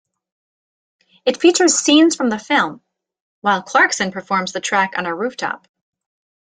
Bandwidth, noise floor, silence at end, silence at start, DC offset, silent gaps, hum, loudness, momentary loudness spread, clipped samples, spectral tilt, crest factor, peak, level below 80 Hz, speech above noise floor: 9.6 kHz; under -90 dBFS; 0.85 s; 1.25 s; under 0.1%; 3.20-3.42 s; none; -17 LUFS; 11 LU; under 0.1%; -2.5 dB/octave; 18 dB; -2 dBFS; -66 dBFS; over 73 dB